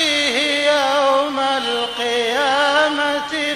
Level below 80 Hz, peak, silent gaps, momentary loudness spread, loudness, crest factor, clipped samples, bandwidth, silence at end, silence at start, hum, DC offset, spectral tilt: -58 dBFS; -2 dBFS; none; 4 LU; -17 LUFS; 16 dB; under 0.1%; 15 kHz; 0 s; 0 s; none; under 0.1%; -1 dB/octave